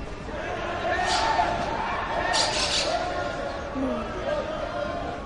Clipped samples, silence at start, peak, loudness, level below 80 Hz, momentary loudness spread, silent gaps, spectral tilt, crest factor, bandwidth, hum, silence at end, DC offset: under 0.1%; 0 s; -12 dBFS; -26 LUFS; -42 dBFS; 8 LU; none; -3 dB/octave; 16 dB; 11.5 kHz; none; 0 s; under 0.1%